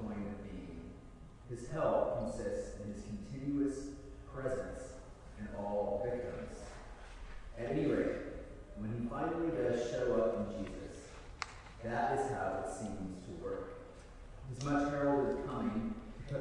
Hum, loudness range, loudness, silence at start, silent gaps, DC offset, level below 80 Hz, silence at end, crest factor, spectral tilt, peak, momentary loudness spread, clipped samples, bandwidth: none; 4 LU; -39 LUFS; 0 s; none; under 0.1%; -54 dBFS; 0 s; 22 dB; -6.5 dB/octave; -18 dBFS; 19 LU; under 0.1%; 11 kHz